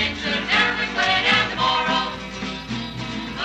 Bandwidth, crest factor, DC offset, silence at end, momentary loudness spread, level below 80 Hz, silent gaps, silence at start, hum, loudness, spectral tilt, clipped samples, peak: 10 kHz; 16 dB; under 0.1%; 0 s; 12 LU; -44 dBFS; none; 0 s; none; -21 LUFS; -3.5 dB/octave; under 0.1%; -6 dBFS